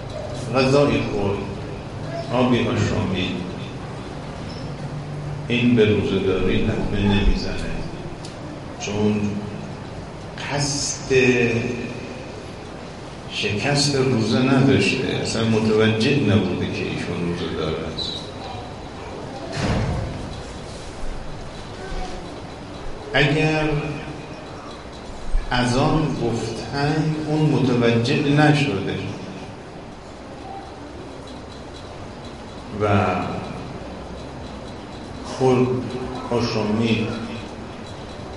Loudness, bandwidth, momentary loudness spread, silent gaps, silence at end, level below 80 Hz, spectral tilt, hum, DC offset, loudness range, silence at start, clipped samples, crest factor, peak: -22 LUFS; 11.5 kHz; 17 LU; none; 0 s; -36 dBFS; -5.5 dB/octave; none; 0.2%; 9 LU; 0 s; under 0.1%; 18 dB; -4 dBFS